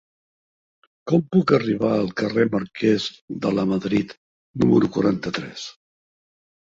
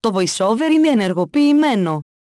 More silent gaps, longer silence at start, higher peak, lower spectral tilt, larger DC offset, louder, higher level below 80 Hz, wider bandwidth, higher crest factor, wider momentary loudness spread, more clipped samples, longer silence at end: first, 3.21-3.28 s, 4.17-4.54 s vs none; first, 1.05 s vs 0.05 s; about the same, -2 dBFS vs -4 dBFS; first, -7 dB/octave vs -5 dB/octave; neither; second, -21 LUFS vs -16 LUFS; first, -56 dBFS vs -64 dBFS; second, 7.6 kHz vs 12 kHz; first, 20 dB vs 12 dB; first, 15 LU vs 5 LU; neither; first, 1.05 s vs 0.2 s